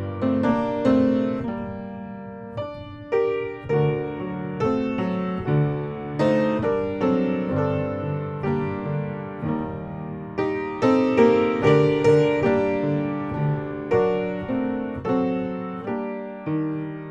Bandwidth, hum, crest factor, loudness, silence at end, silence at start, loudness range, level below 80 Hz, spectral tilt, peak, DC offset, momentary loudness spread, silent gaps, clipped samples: 8.6 kHz; none; 18 dB; -23 LUFS; 0 s; 0 s; 7 LU; -52 dBFS; -8.5 dB/octave; -4 dBFS; under 0.1%; 13 LU; none; under 0.1%